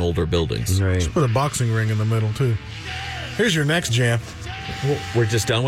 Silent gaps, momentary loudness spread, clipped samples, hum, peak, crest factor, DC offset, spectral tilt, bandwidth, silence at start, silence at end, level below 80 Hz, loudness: none; 9 LU; under 0.1%; none; -8 dBFS; 12 dB; under 0.1%; -5 dB/octave; 15.5 kHz; 0 s; 0 s; -38 dBFS; -21 LUFS